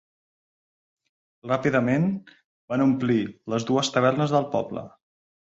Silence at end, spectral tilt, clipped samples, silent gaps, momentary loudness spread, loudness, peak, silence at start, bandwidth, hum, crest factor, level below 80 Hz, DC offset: 0.7 s; -6 dB/octave; under 0.1%; 2.44-2.68 s; 11 LU; -24 LUFS; -6 dBFS; 1.45 s; 8 kHz; none; 20 dB; -64 dBFS; under 0.1%